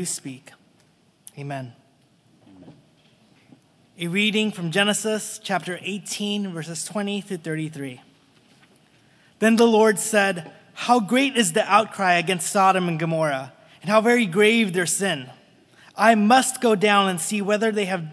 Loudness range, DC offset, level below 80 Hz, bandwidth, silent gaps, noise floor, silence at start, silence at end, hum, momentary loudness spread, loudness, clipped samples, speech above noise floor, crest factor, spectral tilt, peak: 11 LU; under 0.1%; -80 dBFS; 11 kHz; none; -60 dBFS; 0 s; 0 s; none; 16 LU; -21 LUFS; under 0.1%; 39 dB; 22 dB; -4 dB/octave; -2 dBFS